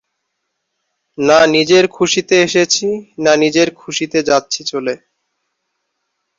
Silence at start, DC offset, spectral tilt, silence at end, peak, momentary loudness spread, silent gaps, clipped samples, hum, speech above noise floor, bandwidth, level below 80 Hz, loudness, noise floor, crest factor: 1.2 s; under 0.1%; -3 dB/octave; 1.4 s; 0 dBFS; 11 LU; none; under 0.1%; none; 59 dB; 7.8 kHz; -56 dBFS; -13 LUFS; -73 dBFS; 14 dB